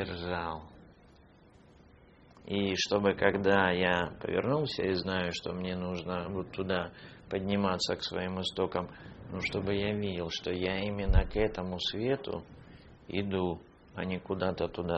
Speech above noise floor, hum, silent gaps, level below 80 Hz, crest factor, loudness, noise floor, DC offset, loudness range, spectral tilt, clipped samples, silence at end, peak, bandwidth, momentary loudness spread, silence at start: 27 dB; none; none; -42 dBFS; 24 dB; -32 LUFS; -59 dBFS; under 0.1%; 5 LU; -4 dB/octave; under 0.1%; 0 s; -8 dBFS; 8 kHz; 12 LU; 0 s